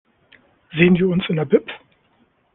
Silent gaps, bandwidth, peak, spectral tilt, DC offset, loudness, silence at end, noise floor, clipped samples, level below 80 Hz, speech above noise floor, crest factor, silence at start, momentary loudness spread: none; 3.9 kHz; -2 dBFS; -11 dB/octave; under 0.1%; -18 LUFS; 0.75 s; -61 dBFS; under 0.1%; -54 dBFS; 44 dB; 18 dB; 0.75 s; 19 LU